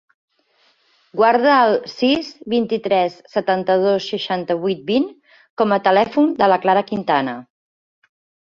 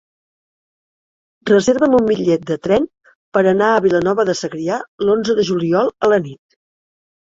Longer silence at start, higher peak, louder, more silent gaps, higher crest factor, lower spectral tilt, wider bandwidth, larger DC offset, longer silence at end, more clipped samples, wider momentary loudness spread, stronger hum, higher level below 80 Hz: second, 1.15 s vs 1.45 s; about the same, -2 dBFS vs -2 dBFS; about the same, -18 LUFS vs -16 LUFS; second, 5.50-5.57 s vs 3.15-3.32 s, 4.88-4.98 s; about the same, 16 dB vs 16 dB; about the same, -6 dB/octave vs -5.5 dB/octave; about the same, 7.4 kHz vs 7.8 kHz; neither; first, 1.05 s vs 0.9 s; neither; about the same, 8 LU vs 8 LU; neither; second, -62 dBFS vs -54 dBFS